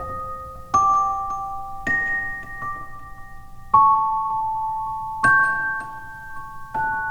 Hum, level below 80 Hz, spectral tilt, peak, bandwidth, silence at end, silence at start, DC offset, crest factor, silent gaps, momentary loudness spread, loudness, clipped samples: none; -44 dBFS; -4 dB/octave; -2 dBFS; over 20 kHz; 0 s; 0 s; under 0.1%; 20 dB; none; 20 LU; -21 LUFS; under 0.1%